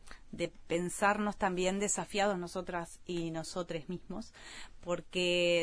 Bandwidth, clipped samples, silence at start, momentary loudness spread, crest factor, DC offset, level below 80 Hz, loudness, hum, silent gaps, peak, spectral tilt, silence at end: 11 kHz; under 0.1%; 0.05 s; 15 LU; 20 dB; under 0.1%; -56 dBFS; -34 LUFS; none; none; -14 dBFS; -3.5 dB/octave; 0 s